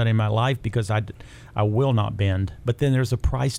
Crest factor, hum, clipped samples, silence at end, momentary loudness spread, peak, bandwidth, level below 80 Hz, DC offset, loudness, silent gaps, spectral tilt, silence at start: 12 dB; none; under 0.1%; 0 s; 6 LU; -10 dBFS; 13 kHz; -38 dBFS; under 0.1%; -23 LUFS; none; -7 dB/octave; 0 s